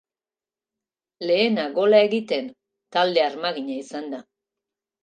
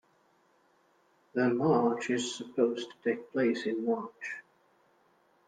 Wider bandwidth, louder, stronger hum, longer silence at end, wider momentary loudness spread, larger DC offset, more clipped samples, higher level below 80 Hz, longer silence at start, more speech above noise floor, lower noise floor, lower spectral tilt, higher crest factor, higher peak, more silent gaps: about the same, 9.2 kHz vs 9.6 kHz; first, -22 LUFS vs -31 LUFS; neither; second, 0.8 s vs 1.05 s; first, 15 LU vs 12 LU; neither; neither; about the same, -80 dBFS vs -76 dBFS; second, 1.2 s vs 1.35 s; first, over 69 dB vs 38 dB; first, under -90 dBFS vs -68 dBFS; about the same, -5 dB/octave vs -5 dB/octave; about the same, 20 dB vs 18 dB; first, -4 dBFS vs -14 dBFS; neither